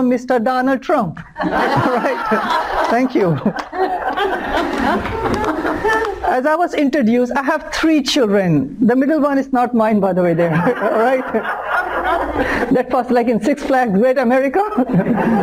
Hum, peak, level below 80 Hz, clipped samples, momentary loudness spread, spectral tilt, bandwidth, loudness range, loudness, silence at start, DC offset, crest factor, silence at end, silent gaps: none; -6 dBFS; -40 dBFS; under 0.1%; 5 LU; -6 dB/octave; 16 kHz; 3 LU; -16 LUFS; 0 s; under 0.1%; 10 dB; 0 s; none